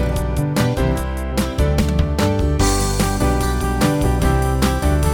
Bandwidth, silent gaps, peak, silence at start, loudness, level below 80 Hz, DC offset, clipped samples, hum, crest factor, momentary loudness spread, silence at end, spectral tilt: 18.5 kHz; none; -2 dBFS; 0 s; -18 LUFS; -22 dBFS; under 0.1%; under 0.1%; none; 14 dB; 3 LU; 0 s; -5.5 dB/octave